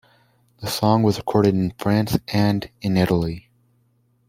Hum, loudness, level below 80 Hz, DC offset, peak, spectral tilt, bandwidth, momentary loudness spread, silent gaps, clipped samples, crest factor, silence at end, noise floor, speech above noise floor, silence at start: none; -21 LUFS; -48 dBFS; under 0.1%; -2 dBFS; -6.5 dB/octave; 16.5 kHz; 9 LU; none; under 0.1%; 18 dB; 0.9 s; -63 dBFS; 43 dB; 0.6 s